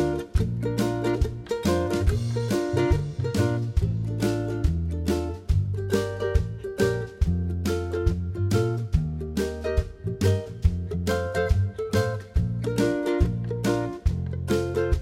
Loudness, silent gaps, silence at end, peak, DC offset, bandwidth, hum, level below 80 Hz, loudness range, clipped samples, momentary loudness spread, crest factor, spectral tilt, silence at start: -26 LUFS; none; 0 s; -8 dBFS; under 0.1%; 16 kHz; none; -32 dBFS; 1 LU; under 0.1%; 4 LU; 16 dB; -7 dB/octave; 0 s